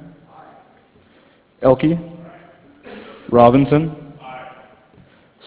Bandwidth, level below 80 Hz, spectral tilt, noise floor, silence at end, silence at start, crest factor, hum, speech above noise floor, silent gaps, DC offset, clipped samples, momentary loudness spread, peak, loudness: 4 kHz; -48 dBFS; -12 dB/octave; -53 dBFS; 1 s; 1.6 s; 20 dB; none; 40 dB; none; under 0.1%; under 0.1%; 27 LU; 0 dBFS; -15 LUFS